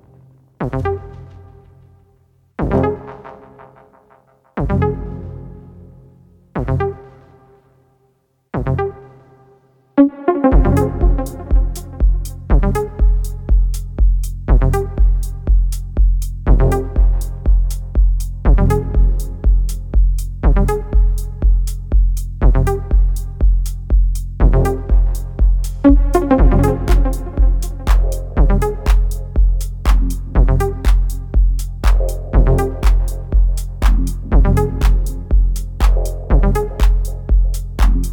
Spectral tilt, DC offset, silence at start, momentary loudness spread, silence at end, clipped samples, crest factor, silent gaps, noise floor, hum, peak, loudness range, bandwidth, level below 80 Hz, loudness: -7.5 dB/octave; under 0.1%; 0.6 s; 7 LU; 0 s; under 0.1%; 14 dB; none; -61 dBFS; none; 0 dBFS; 9 LU; 13 kHz; -16 dBFS; -18 LUFS